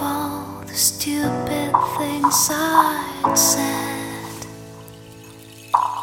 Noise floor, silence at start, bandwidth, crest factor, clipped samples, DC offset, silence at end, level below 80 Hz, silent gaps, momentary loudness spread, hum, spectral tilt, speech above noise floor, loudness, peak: -41 dBFS; 0 s; 17 kHz; 20 dB; under 0.1%; under 0.1%; 0 s; -54 dBFS; none; 19 LU; none; -2.5 dB/octave; 22 dB; -19 LUFS; -2 dBFS